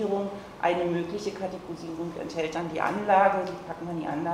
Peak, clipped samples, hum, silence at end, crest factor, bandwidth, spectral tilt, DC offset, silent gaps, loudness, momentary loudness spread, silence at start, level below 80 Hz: -8 dBFS; under 0.1%; none; 0 s; 20 dB; 14.5 kHz; -6 dB/octave; under 0.1%; none; -29 LUFS; 14 LU; 0 s; -60 dBFS